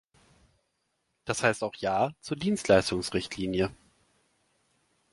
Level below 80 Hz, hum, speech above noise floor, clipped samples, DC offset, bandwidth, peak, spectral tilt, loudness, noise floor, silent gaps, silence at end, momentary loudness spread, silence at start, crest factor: -56 dBFS; none; 50 dB; under 0.1%; under 0.1%; 11.5 kHz; -6 dBFS; -4.5 dB/octave; -28 LUFS; -77 dBFS; none; 1.4 s; 9 LU; 1.25 s; 24 dB